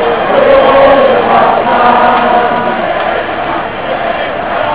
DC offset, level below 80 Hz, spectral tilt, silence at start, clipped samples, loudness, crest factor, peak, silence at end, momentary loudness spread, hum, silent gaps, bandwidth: 2%; -38 dBFS; -8.5 dB/octave; 0 s; 1%; -9 LUFS; 8 dB; 0 dBFS; 0 s; 9 LU; none; none; 4 kHz